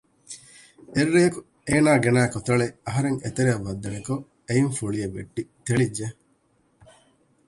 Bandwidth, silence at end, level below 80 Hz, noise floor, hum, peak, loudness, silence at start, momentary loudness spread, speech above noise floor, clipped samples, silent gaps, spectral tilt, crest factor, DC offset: 11.5 kHz; 1.35 s; -52 dBFS; -65 dBFS; none; -6 dBFS; -24 LUFS; 0.3 s; 16 LU; 42 dB; under 0.1%; none; -6 dB/octave; 18 dB; under 0.1%